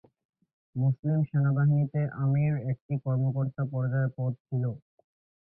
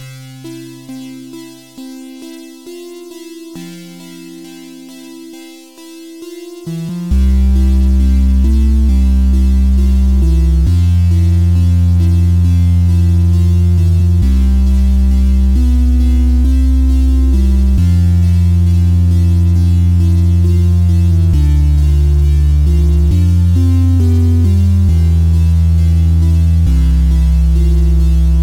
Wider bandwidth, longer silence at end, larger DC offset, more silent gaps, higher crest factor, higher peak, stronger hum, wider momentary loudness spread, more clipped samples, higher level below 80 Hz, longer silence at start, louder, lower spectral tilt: second, 2.7 kHz vs 10 kHz; first, 0.65 s vs 0 s; neither; first, 0.99-1.03 s, 2.81-2.89 s, 4.40-4.45 s vs none; about the same, 12 dB vs 8 dB; second, -18 dBFS vs -2 dBFS; neither; second, 7 LU vs 20 LU; neither; second, -62 dBFS vs -12 dBFS; first, 0.75 s vs 0 s; second, -29 LUFS vs -11 LUFS; first, -14.5 dB/octave vs -8.5 dB/octave